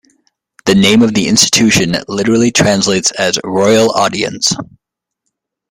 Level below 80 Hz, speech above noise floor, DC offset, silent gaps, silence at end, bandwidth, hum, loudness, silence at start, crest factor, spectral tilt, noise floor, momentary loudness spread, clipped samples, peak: -46 dBFS; 65 dB; under 0.1%; none; 1.05 s; 16.5 kHz; none; -11 LUFS; 0.65 s; 12 dB; -3.5 dB/octave; -76 dBFS; 7 LU; under 0.1%; 0 dBFS